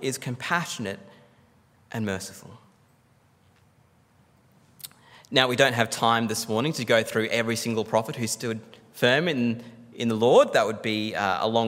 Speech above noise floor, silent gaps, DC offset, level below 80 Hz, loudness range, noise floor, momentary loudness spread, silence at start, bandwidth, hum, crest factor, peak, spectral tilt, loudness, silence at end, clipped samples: 37 dB; none; under 0.1%; -72 dBFS; 15 LU; -61 dBFS; 19 LU; 0 s; 16 kHz; none; 24 dB; -2 dBFS; -4 dB/octave; -24 LUFS; 0 s; under 0.1%